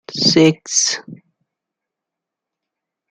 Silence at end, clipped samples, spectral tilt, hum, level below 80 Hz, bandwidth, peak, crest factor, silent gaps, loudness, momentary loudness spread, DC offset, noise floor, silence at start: 1.95 s; under 0.1%; -3 dB/octave; none; -60 dBFS; 10.5 kHz; -2 dBFS; 18 dB; none; -14 LUFS; 8 LU; under 0.1%; -83 dBFS; 0.1 s